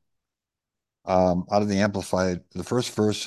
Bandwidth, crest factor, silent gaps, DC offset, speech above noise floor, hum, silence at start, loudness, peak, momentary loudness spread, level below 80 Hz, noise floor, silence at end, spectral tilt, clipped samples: 12.5 kHz; 18 dB; none; under 0.1%; 64 dB; none; 1.05 s; -24 LUFS; -6 dBFS; 6 LU; -48 dBFS; -87 dBFS; 0 s; -5.5 dB/octave; under 0.1%